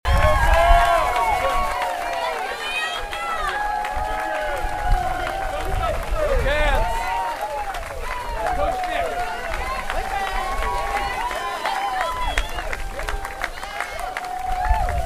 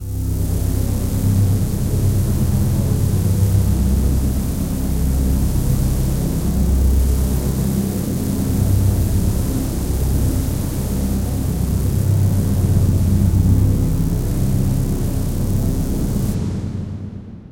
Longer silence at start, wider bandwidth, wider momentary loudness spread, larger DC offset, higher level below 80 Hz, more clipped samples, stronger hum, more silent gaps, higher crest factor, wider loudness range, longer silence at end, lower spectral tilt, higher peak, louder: about the same, 0.05 s vs 0 s; about the same, 15.5 kHz vs 17 kHz; first, 10 LU vs 5 LU; neither; about the same, -26 dBFS vs -22 dBFS; neither; neither; neither; first, 22 dB vs 14 dB; first, 5 LU vs 2 LU; about the same, 0 s vs 0 s; second, -4 dB/octave vs -7 dB/octave; first, 0 dBFS vs -4 dBFS; second, -23 LUFS vs -19 LUFS